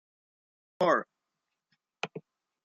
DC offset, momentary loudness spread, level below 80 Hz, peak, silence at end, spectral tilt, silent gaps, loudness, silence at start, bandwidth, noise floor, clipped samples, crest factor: under 0.1%; 22 LU; -84 dBFS; -12 dBFS; 0.45 s; -5 dB/octave; none; -31 LUFS; 0.8 s; 7.6 kHz; -86 dBFS; under 0.1%; 24 dB